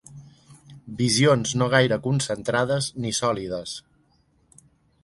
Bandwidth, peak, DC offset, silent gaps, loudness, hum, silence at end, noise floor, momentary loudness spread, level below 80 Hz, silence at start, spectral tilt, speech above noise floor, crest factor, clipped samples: 11.5 kHz; -4 dBFS; under 0.1%; none; -23 LUFS; none; 1.25 s; -63 dBFS; 13 LU; -56 dBFS; 0.1 s; -4.5 dB/octave; 41 dB; 22 dB; under 0.1%